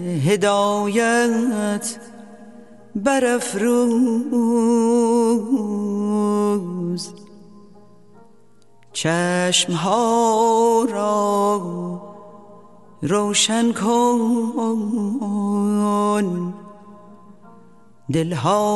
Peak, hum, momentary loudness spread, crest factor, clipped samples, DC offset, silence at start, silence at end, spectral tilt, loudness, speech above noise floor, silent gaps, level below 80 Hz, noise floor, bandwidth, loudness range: -4 dBFS; none; 11 LU; 16 dB; under 0.1%; 0.3%; 0 s; 0 s; -4.5 dB/octave; -19 LUFS; 37 dB; none; -64 dBFS; -55 dBFS; 12 kHz; 5 LU